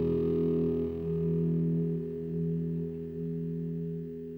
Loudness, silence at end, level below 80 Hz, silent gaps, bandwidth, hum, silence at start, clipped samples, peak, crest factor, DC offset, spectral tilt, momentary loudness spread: -32 LUFS; 0 s; -54 dBFS; none; 3.3 kHz; 50 Hz at -65 dBFS; 0 s; under 0.1%; -20 dBFS; 12 dB; under 0.1%; -12 dB/octave; 8 LU